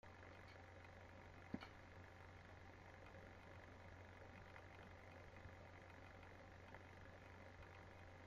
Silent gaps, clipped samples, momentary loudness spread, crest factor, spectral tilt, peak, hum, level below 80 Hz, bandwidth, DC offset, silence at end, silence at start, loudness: none; under 0.1%; 2 LU; 26 dB; -6 dB/octave; -34 dBFS; none; -72 dBFS; 11.5 kHz; under 0.1%; 0 s; 0.05 s; -61 LUFS